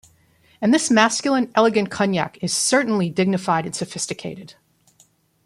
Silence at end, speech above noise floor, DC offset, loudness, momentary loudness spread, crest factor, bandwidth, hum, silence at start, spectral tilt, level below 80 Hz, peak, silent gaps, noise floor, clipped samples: 0.95 s; 39 dB; under 0.1%; -20 LUFS; 11 LU; 20 dB; 12.5 kHz; none; 0.6 s; -4 dB/octave; -62 dBFS; -2 dBFS; none; -58 dBFS; under 0.1%